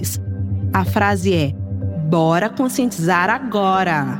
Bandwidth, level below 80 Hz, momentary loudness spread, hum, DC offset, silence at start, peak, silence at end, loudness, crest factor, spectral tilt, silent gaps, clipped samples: 17 kHz; -44 dBFS; 8 LU; none; under 0.1%; 0 s; -2 dBFS; 0 s; -18 LUFS; 16 dB; -6 dB/octave; none; under 0.1%